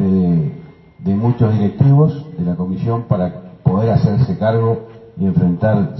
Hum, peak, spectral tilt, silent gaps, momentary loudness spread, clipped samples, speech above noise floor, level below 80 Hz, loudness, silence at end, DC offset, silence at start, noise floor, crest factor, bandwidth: none; 0 dBFS; -11.5 dB/octave; none; 10 LU; under 0.1%; 22 dB; -44 dBFS; -16 LUFS; 0 s; under 0.1%; 0 s; -36 dBFS; 14 dB; 6 kHz